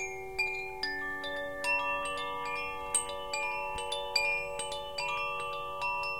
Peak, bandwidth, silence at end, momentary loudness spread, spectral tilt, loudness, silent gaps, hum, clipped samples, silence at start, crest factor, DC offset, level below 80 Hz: -14 dBFS; 17 kHz; 0 s; 7 LU; -0.5 dB/octave; -33 LUFS; none; none; under 0.1%; 0 s; 22 dB; 0.3%; -58 dBFS